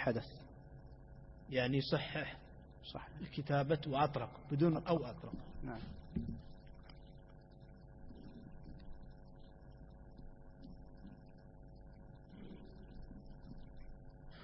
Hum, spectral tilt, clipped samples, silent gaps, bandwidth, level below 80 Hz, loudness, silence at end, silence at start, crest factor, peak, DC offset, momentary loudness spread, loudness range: none; -5.5 dB/octave; under 0.1%; none; 5.6 kHz; -56 dBFS; -39 LUFS; 0 s; 0 s; 22 dB; -20 dBFS; under 0.1%; 23 LU; 19 LU